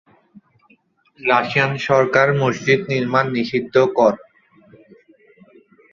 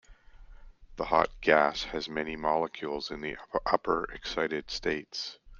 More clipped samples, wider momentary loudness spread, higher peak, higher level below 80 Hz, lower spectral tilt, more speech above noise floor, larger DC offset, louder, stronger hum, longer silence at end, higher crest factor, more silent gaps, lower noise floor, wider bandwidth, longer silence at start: neither; second, 5 LU vs 12 LU; first, -2 dBFS vs -6 dBFS; second, -60 dBFS vs -52 dBFS; first, -6 dB/octave vs -4 dB/octave; first, 41 dB vs 21 dB; neither; first, -17 LUFS vs -30 LUFS; neither; first, 1.75 s vs 0 s; second, 18 dB vs 24 dB; neither; first, -58 dBFS vs -52 dBFS; about the same, 7.4 kHz vs 7.4 kHz; first, 1.2 s vs 0.1 s